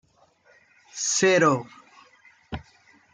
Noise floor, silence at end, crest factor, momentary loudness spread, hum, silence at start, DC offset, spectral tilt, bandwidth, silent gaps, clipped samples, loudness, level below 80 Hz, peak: -60 dBFS; 0.55 s; 20 dB; 22 LU; none; 0.95 s; under 0.1%; -3.5 dB/octave; 10 kHz; none; under 0.1%; -21 LUFS; -58 dBFS; -8 dBFS